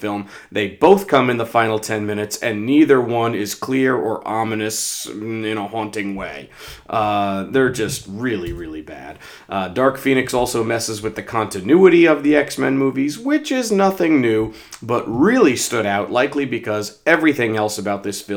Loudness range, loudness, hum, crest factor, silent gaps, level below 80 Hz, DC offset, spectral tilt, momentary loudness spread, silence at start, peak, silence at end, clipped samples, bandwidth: 6 LU; -18 LUFS; none; 18 dB; none; -50 dBFS; under 0.1%; -4.5 dB/octave; 13 LU; 0 s; 0 dBFS; 0 s; under 0.1%; over 20 kHz